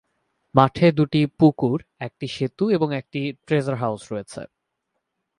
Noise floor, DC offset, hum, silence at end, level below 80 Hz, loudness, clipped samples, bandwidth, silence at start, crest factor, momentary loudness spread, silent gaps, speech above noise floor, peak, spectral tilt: -78 dBFS; under 0.1%; none; 0.95 s; -58 dBFS; -22 LUFS; under 0.1%; 11 kHz; 0.55 s; 22 dB; 14 LU; none; 57 dB; 0 dBFS; -7.5 dB/octave